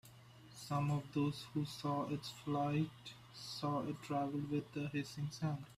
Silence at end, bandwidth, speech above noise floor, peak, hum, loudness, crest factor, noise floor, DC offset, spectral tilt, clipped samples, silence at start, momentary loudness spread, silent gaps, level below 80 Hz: 0 s; 15 kHz; 20 dB; -26 dBFS; none; -41 LUFS; 14 dB; -60 dBFS; under 0.1%; -6.5 dB/octave; under 0.1%; 0.05 s; 15 LU; none; -72 dBFS